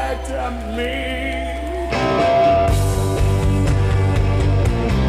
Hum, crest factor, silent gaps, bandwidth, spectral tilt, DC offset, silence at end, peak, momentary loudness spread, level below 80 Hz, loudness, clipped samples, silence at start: none; 12 dB; none; 14.5 kHz; -6.5 dB/octave; under 0.1%; 0 s; -4 dBFS; 10 LU; -24 dBFS; -19 LUFS; under 0.1%; 0 s